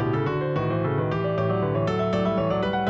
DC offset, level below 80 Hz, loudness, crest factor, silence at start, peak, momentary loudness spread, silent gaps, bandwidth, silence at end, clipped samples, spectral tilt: under 0.1%; -50 dBFS; -25 LUFS; 12 dB; 0 s; -12 dBFS; 2 LU; none; 7.4 kHz; 0 s; under 0.1%; -8.5 dB/octave